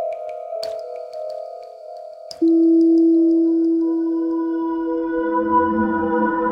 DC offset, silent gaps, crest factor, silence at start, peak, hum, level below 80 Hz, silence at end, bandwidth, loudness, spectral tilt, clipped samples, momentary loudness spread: under 0.1%; none; 12 dB; 0 s; -6 dBFS; none; -54 dBFS; 0 s; 5.8 kHz; -18 LUFS; -7.5 dB/octave; under 0.1%; 20 LU